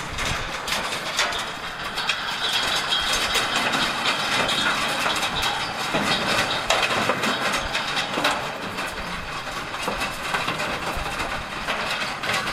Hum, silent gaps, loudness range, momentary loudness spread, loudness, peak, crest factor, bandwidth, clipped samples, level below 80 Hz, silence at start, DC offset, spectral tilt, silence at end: none; none; 5 LU; 8 LU; -23 LUFS; -6 dBFS; 20 dB; 16 kHz; under 0.1%; -44 dBFS; 0 s; under 0.1%; -2 dB/octave; 0 s